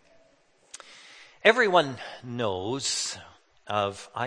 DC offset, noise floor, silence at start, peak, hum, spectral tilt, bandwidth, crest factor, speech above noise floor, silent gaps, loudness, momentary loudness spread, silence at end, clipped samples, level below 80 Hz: under 0.1%; -63 dBFS; 0.9 s; -2 dBFS; none; -3 dB/octave; 9.8 kHz; 26 dB; 37 dB; none; -26 LUFS; 25 LU; 0 s; under 0.1%; -70 dBFS